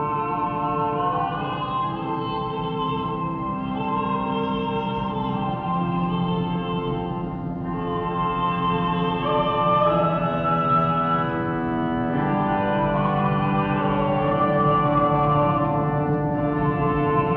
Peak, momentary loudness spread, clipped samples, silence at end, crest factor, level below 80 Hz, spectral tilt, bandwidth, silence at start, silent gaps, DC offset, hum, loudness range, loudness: -8 dBFS; 7 LU; under 0.1%; 0 s; 16 dB; -44 dBFS; -10 dB/octave; 4.9 kHz; 0 s; none; under 0.1%; none; 5 LU; -23 LUFS